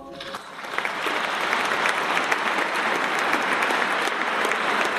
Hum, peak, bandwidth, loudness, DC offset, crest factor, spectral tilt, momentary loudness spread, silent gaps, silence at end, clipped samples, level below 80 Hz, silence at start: none; -8 dBFS; 14 kHz; -23 LUFS; under 0.1%; 18 dB; -2 dB/octave; 8 LU; none; 0 s; under 0.1%; -66 dBFS; 0 s